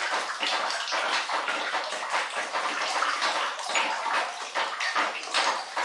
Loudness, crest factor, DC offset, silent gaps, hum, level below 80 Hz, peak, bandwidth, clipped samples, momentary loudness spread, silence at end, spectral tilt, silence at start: -27 LUFS; 18 dB; under 0.1%; none; none; -88 dBFS; -12 dBFS; 11.5 kHz; under 0.1%; 4 LU; 0 s; 1.5 dB/octave; 0 s